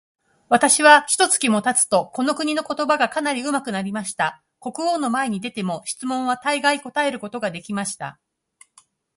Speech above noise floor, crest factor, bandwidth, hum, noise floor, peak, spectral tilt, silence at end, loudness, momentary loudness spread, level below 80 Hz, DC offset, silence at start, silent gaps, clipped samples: 37 dB; 22 dB; 12 kHz; none; -57 dBFS; 0 dBFS; -2.5 dB/octave; 1.05 s; -20 LUFS; 14 LU; -68 dBFS; under 0.1%; 0.5 s; none; under 0.1%